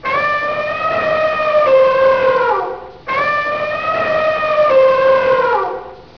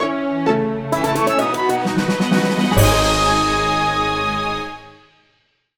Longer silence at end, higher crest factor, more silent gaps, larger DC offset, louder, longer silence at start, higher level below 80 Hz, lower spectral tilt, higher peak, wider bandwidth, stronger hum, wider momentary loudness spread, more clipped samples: second, 0.2 s vs 0.85 s; second, 12 dB vs 18 dB; neither; first, 0.4% vs under 0.1%; first, -14 LUFS vs -17 LUFS; about the same, 0 s vs 0 s; second, -50 dBFS vs -32 dBFS; about the same, -5 dB/octave vs -4.5 dB/octave; about the same, -2 dBFS vs 0 dBFS; second, 5.4 kHz vs 19.5 kHz; neither; about the same, 8 LU vs 7 LU; neither